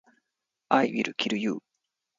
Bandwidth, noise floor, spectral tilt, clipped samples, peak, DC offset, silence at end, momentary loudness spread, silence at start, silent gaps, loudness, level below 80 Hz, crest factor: 7.6 kHz; -85 dBFS; -4.5 dB/octave; under 0.1%; -6 dBFS; under 0.1%; 0.6 s; 8 LU; 0.7 s; none; -27 LUFS; -76 dBFS; 24 dB